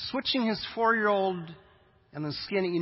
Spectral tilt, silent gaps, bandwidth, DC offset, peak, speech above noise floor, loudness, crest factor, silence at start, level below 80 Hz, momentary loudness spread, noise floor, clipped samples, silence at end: -9 dB/octave; none; 5.8 kHz; under 0.1%; -12 dBFS; 32 dB; -28 LUFS; 16 dB; 0 s; -64 dBFS; 14 LU; -60 dBFS; under 0.1%; 0 s